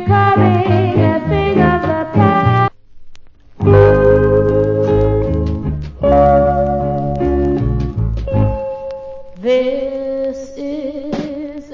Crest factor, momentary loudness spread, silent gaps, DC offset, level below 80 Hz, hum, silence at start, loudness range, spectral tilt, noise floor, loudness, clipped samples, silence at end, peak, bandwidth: 14 dB; 13 LU; none; under 0.1%; -26 dBFS; none; 0 s; 7 LU; -9 dB/octave; -35 dBFS; -14 LUFS; under 0.1%; 0 s; 0 dBFS; 7 kHz